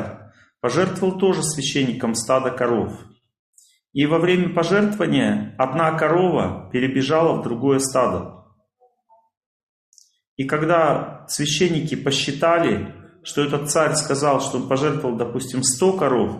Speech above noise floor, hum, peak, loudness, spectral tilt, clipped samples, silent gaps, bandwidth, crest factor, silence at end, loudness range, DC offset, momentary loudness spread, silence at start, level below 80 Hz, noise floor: 42 dB; none; -4 dBFS; -20 LUFS; -4.5 dB/octave; under 0.1%; 3.39-3.53 s, 9.37-9.92 s, 10.27-10.37 s; 14.5 kHz; 16 dB; 0 s; 5 LU; under 0.1%; 7 LU; 0 s; -58 dBFS; -62 dBFS